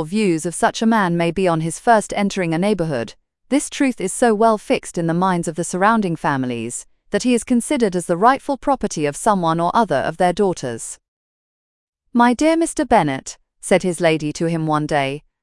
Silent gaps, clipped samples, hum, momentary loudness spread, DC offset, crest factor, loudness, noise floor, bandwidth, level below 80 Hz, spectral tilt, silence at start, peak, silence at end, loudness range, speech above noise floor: 11.08-11.93 s; under 0.1%; none; 9 LU; under 0.1%; 18 dB; -18 LUFS; under -90 dBFS; 12 kHz; -48 dBFS; -5 dB/octave; 0 s; 0 dBFS; 0.25 s; 2 LU; over 72 dB